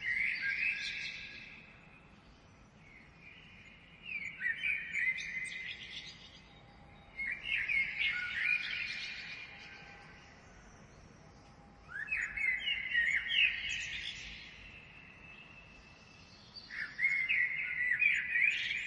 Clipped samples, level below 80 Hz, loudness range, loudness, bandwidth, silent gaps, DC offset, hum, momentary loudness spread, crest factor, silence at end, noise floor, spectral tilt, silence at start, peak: under 0.1%; -64 dBFS; 11 LU; -33 LUFS; 11 kHz; none; under 0.1%; none; 24 LU; 20 dB; 0 s; -60 dBFS; -1 dB/octave; 0 s; -18 dBFS